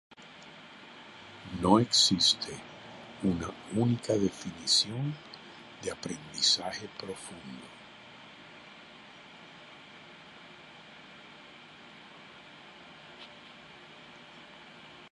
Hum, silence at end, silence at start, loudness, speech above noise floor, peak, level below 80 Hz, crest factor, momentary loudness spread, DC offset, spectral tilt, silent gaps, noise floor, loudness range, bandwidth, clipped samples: none; 0.05 s; 0.2 s; -28 LUFS; 22 dB; -8 dBFS; -62 dBFS; 26 dB; 24 LU; under 0.1%; -3.5 dB/octave; none; -52 dBFS; 22 LU; 11.5 kHz; under 0.1%